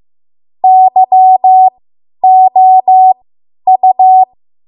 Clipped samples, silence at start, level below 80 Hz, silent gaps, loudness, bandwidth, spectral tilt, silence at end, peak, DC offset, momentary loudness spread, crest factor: under 0.1%; 0.65 s; -68 dBFS; none; -7 LUFS; 1 kHz; -9 dB/octave; 0.45 s; 0 dBFS; under 0.1%; 7 LU; 8 dB